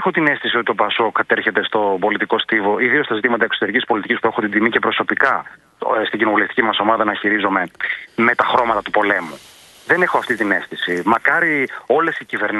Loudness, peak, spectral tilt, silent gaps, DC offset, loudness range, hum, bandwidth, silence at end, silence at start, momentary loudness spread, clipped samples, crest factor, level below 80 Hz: -17 LUFS; 0 dBFS; -5.5 dB/octave; none; under 0.1%; 1 LU; none; 12 kHz; 0 s; 0 s; 5 LU; under 0.1%; 18 dB; -60 dBFS